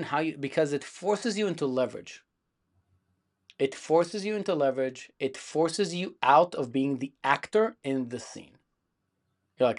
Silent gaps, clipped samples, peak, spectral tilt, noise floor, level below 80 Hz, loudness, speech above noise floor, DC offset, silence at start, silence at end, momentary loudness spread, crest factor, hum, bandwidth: none; under 0.1%; -6 dBFS; -5 dB/octave; -79 dBFS; -78 dBFS; -28 LUFS; 51 dB; under 0.1%; 0 s; 0 s; 10 LU; 22 dB; none; 11 kHz